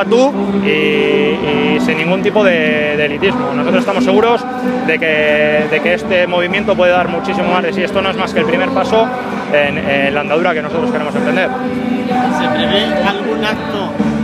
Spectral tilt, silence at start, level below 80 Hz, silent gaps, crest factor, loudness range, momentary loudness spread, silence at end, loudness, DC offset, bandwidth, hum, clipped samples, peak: -6 dB/octave; 0 s; -44 dBFS; none; 14 dB; 2 LU; 5 LU; 0 s; -13 LUFS; under 0.1%; 13 kHz; none; under 0.1%; 0 dBFS